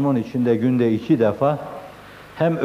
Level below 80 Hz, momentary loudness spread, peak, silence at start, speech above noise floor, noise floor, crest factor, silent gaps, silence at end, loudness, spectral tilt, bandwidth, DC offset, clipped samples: -58 dBFS; 19 LU; -6 dBFS; 0 s; 23 dB; -41 dBFS; 14 dB; none; 0 s; -20 LUFS; -9 dB/octave; 13.5 kHz; under 0.1%; under 0.1%